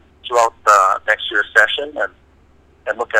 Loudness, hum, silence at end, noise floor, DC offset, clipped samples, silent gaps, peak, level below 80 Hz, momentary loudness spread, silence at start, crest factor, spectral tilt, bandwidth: -16 LUFS; none; 0 s; -51 dBFS; under 0.1%; under 0.1%; none; 0 dBFS; -54 dBFS; 13 LU; 0.25 s; 18 dB; -0.5 dB/octave; 16.5 kHz